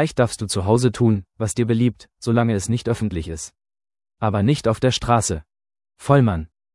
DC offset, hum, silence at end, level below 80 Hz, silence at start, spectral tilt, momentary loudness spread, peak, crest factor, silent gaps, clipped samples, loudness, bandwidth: under 0.1%; none; 0.3 s; -44 dBFS; 0 s; -6 dB/octave; 12 LU; 0 dBFS; 20 dB; none; under 0.1%; -20 LUFS; 12 kHz